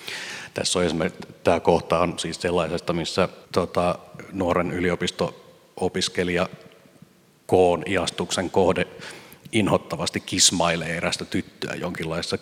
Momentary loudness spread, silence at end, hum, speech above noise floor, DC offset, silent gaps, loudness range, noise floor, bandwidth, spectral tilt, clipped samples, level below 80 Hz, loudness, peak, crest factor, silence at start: 10 LU; 0.05 s; none; 30 dB; under 0.1%; none; 3 LU; -54 dBFS; 16 kHz; -3.5 dB/octave; under 0.1%; -46 dBFS; -24 LUFS; -2 dBFS; 22 dB; 0 s